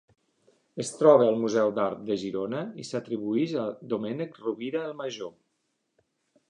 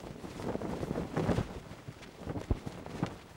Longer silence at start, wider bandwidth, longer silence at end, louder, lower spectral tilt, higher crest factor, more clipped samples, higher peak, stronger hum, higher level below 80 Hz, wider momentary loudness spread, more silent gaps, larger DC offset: first, 0.75 s vs 0 s; second, 10.5 kHz vs 17 kHz; first, 1.2 s vs 0 s; first, -27 LUFS vs -38 LUFS; about the same, -6 dB/octave vs -7 dB/octave; about the same, 22 dB vs 22 dB; neither; first, -6 dBFS vs -16 dBFS; neither; second, -74 dBFS vs -48 dBFS; about the same, 15 LU vs 13 LU; neither; neither